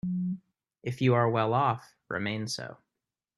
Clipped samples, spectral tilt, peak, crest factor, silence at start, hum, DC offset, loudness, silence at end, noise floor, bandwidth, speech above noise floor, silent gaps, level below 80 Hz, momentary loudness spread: under 0.1%; -6 dB/octave; -10 dBFS; 20 dB; 0.05 s; none; under 0.1%; -29 LUFS; 0.65 s; -88 dBFS; 12.5 kHz; 60 dB; none; -66 dBFS; 14 LU